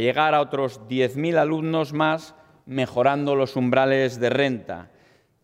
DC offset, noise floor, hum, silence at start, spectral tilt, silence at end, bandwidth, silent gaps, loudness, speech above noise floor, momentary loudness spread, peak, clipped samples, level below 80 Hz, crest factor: under 0.1%; -58 dBFS; none; 0 s; -6.5 dB/octave; 0.6 s; 15.5 kHz; none; -22 LUFS; 36 dB; 9 LU; -8 dBFS; under 0.1%; -68 dBFS; 16 dB